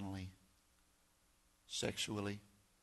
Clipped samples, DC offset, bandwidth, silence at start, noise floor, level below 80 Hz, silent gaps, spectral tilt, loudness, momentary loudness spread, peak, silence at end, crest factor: under 0.1%; under 0.1%; 12 kHz; 0 s; -74 dBFS; -72 dBFS; none; -3.5 dB/octave; -43 LUFS; 12 LU; -26 dBFS; 0.35 s; 22 dB